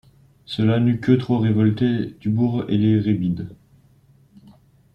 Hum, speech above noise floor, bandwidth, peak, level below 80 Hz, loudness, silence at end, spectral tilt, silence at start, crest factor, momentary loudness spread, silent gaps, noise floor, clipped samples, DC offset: none; 35 dB; 5.8 kHz; -4 dBFS; -54 dBFS; -20 LUFS; 1.4 s; -9.5 dB/octave; 0.5 s; 18 dB; 7 LU; none; -54 dBFS; under 0.1%; under 0.1%